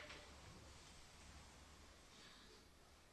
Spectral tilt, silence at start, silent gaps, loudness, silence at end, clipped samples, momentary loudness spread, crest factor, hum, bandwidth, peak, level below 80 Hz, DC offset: -3 dB/octave; 0 s; none; -62 LUFS; 0 s; under 0.1%; 6 LU; 18 dB; none; 12 kHz; -44 dBFS; -70 dBFS; under 0.1%